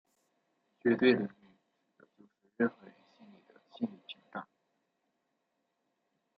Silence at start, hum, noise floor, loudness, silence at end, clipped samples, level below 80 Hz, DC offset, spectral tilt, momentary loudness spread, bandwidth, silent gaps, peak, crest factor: 0.85 s; none; -82 dBFS; -33 LUFS; 1.95 s; under 0.1%; -86 dBFS; under 0.1%; -4.5 dB/octave; 19 LU; 5.2 kHz; none; -12 dBFS; 26 dB